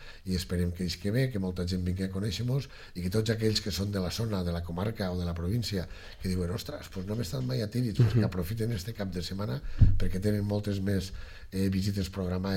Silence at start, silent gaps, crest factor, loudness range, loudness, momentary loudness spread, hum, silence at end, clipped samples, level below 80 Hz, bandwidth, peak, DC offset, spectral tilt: 0 s; none; 20 dB; 4 LU; -31 LUFS; 9 LU; none; 0 s; under 0.1%; -38 dBFS; 16.5 kHz; -8 dBFS; under 0.1%; -6.5 dB/octave